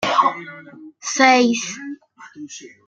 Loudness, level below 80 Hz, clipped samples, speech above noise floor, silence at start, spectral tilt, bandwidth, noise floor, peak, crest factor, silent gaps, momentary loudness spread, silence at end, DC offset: -17 LUFS; -70 dBFS; under 0.1%; 23 dB; 0 s; -2 dB/octave; 9 kHz; -41 dBFS; -2 dBFS; 20 dB; none; 24 LU; 0.2 s; under 0.1%